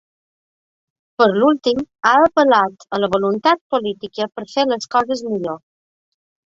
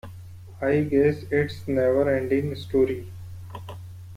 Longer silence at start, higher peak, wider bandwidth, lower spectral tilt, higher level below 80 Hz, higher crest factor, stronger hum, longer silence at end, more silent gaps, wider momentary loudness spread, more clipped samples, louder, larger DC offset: first, 1.2 s vs 0.05 s; first, 0 dBFS vs -10 dBFS; second, 7.8 kHz vs 15.5 kHz; second, -5 dB/octave vs -8 dB/octave; second, -58 dBFS vs -52 dBFS; about the same, 18 dB vs 16 dB; neither; first, 0.9 s vs 0 s; first, 3.61-3.70 s vs none; second, 12 LU vs 19 LU; neither; first, -17 LUFS vs -24 LUFS; neither